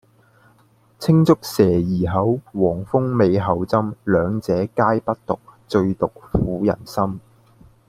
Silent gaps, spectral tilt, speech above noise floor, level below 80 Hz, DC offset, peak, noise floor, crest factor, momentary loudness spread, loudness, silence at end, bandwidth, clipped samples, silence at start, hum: none; -8 dB/octave; 37 dB; -44 dBFS; under 0.1%; -2 dBFS; -56 dBFS; 18 dB; 8 LU; -20 LUFS; 0.7 s; 15.5 kHz; under 0.1%; 1 s; none